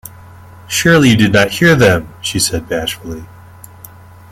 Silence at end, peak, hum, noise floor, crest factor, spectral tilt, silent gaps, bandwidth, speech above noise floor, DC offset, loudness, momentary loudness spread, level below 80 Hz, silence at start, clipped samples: 1.05 s; 0 dBFS; none; -37 dBFS; 14 dB; -4.5 dB/octave; none; 16.5 kHz; 25 dB; under 0.1%; -12 LUFS; 14 LU; -40 dBFS; 0.05 s; under 0.1%